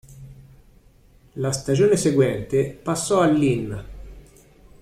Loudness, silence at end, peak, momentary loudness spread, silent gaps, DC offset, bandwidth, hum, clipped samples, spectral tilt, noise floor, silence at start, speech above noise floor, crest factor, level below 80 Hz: -21 LUFS; 0.6 s; -6 dBFS; 15 LU; none; under 0.1%; 14.5 kHz; none; under 0.1%; -6 dB/octave; -53 dBFS; 0.1 s; 33 dB; 18 dB; -46 dBFS